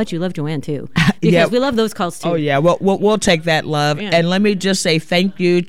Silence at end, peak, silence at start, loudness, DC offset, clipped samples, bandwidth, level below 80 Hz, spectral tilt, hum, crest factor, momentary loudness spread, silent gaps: 0.05 s; -2 dBFS; 0 s; -16 LUFS; 2%; under 0.1%; 15.5 kHz; -44 dBFS; -5 dB/octave; none; 14 dB; 7 LU; none